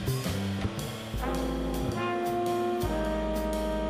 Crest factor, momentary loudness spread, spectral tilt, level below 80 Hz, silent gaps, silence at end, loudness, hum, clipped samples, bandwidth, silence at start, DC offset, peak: 14 dB; 4 LU; -6 dB/octave; -38 dBFS; none; 0 s; -31 LUFS; none; under 0.1%; 15.5 kHz; 0 s; under 0.1%; -16 dBFS